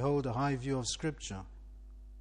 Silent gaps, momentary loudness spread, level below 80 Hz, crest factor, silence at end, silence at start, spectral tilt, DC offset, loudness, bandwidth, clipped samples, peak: none; 22 LU; -50 dBFS; 16 dB; 0 s; 0 s; -5 dB/octave; under 0.1%; -35 LUFS; 10.5 kHz; under 0.1%; -20 dBFS